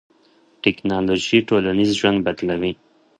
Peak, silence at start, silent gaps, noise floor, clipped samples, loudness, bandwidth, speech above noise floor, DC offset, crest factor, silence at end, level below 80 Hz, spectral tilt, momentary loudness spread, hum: -2 dBFS; 0.65 s; none; -56 dBFS; under 0.1%; -19 LUFS; 10.5 kHz; 37 dB; under 0.1%; 18 dB; 0.45 s; -50 dBFS; -5 dB/octave; 7 LU; none